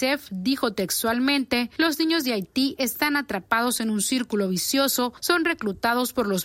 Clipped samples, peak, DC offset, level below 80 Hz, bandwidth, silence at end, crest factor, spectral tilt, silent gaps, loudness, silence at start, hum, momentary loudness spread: under 0.1%; -6 dBFS; under 0.1%; -58 dBFS; 16.5 kHz; 0 s; 18 dB; -3 dB/octave; none; -23 LUFS; 0 s; none; 4 LU